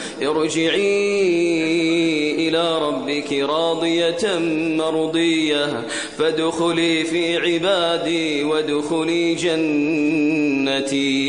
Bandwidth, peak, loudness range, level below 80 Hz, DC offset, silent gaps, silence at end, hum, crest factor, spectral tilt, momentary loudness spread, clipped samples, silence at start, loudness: 10.5 kHz; -6 dBFS; 1 LU; -62 dBFS; 0.2%; none; 0 s; none; 12 dB; -4 dB/octave; 3 LU; under 0.1%; 0 s; -19 LUFS